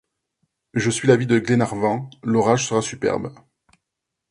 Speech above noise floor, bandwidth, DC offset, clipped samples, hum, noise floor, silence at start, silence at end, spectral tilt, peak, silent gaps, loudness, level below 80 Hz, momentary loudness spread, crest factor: 62 dB; 11.5 kHz; under 0.1%; under 0.1%; none; -82 dBFS; 0.75 s; 1 s; -5.5 dB/octave; 0 dBFS; none; -20 LUFS; -56 dBFS; 10 LU; 20 dB